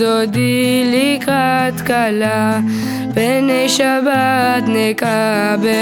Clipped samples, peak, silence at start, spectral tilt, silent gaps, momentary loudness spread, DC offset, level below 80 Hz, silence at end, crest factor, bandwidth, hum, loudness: under 0.1%; -2 dBFS; 0 s; -4.5 dB/octave; none; 3 LU; under 0.1%; -52 dBFS; 0 s; 12 dB; 18 kHz; none; -14 LUFS